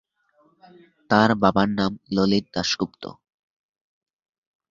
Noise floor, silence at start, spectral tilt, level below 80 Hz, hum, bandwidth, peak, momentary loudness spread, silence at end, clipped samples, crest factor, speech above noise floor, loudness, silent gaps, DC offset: -63 dBFS; 1.1 s; -5.5 dB/octave; -54 dBFS; none; 7.6 kHz; -2 dBFS; 11 LU; 1.6 s; under 0.1%; 24 dB; 41 dB; -22 LUFS; none; under 0.1%